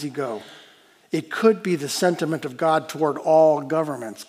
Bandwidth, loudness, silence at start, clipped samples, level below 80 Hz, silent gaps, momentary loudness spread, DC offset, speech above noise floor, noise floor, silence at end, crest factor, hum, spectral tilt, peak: 16 kHz; -22 LUFS; 0 s; under 0.1%; -80 dBFS; none; 13 LU; under 0.1%; 31 dB; -53 dBFS; 0.05 s; 18 dB; none; -5 dB/octave; -4 dBFS